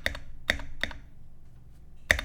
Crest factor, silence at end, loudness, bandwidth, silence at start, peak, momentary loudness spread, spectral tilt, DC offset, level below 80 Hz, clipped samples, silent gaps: 32 dB; 0 s; -32 LUFS; 18.5 kHz; 0 s; 0 dBFS; 18 LU; -2.5 dB/octave; under 0.1%; -42 dBFS; under 0.1%; none